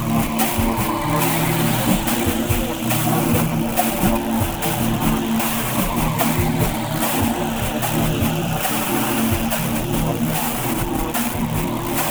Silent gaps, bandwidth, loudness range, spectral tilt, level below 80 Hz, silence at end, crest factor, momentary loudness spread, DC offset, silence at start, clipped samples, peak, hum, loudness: none; over 20 kHz; 1 LU; -4.5 dB/octave; -32 dBFS; 0 s; 16 dB; 3 LU; under 0.1%; 0 s; under 0.1%; -4 dBFS; none; -20 LUFS